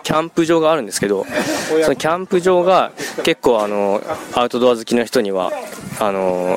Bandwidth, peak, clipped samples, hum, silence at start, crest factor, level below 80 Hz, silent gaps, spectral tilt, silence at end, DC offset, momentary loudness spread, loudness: 16.5 kHz; -2 dBFS; under 0.1%; none; 0.05 s; 16 dB; -52 dBFS; none; -4.5 dB/octave; 0 s; under 0.1%; 7 LU; -17 LUFS